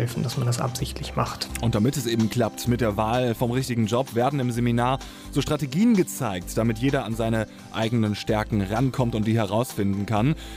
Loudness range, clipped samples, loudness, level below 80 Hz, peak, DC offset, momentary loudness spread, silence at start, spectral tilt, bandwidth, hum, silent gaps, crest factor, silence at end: 1 LU; under 0.1%; -24 LUFS; -42 dBFS; -8 dBFS; under 0.1%; 5 LU; 0 s; -6 dB/octave; 16 kHz; none; none; 16 dB; 0 s